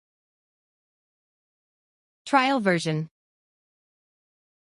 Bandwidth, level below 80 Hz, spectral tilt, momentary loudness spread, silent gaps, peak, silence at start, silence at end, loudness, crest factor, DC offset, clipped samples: 11.5 kHz; -76 dBFS; -5.5 dB/octave; 17 LU; none; -8 dBFS; 2.25 s; 1.6 s; -24 LUFS; 24 dB; under 0.1%; under 0.1%